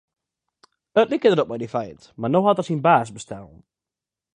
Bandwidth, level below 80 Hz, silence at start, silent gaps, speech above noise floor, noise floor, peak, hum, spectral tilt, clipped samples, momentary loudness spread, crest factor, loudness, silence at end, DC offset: 10 kHz; -62 dBFS; 0.95 s; none; 68 dB; -89 dBFS; -4 dBFS; none; -6.5 dB/octave; under 0.1%; 18 LU; 20 dB; -20 LUFS; 0.9 s; under 0.1%